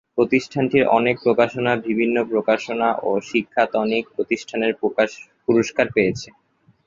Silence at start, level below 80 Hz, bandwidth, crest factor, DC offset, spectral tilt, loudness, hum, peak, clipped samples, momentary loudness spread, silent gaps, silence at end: 0.15 s; -58 dBFS; 7.6 kHz; 18 dB; under 0.1%; -5.5 dB/octave; -20 LUFS; none; -2 dBFS; under 0.1%; 6 LU; none; 0.6 s